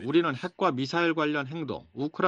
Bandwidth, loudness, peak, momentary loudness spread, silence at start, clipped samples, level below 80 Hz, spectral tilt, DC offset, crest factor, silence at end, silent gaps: 7.8 kHz; -28 LUFS; -10 dBFS; 9 LU; 0 s; under 0.1%; -68 dBFS; -6.5 dB/octave; under 0.1%; 18 dB; 0 s; none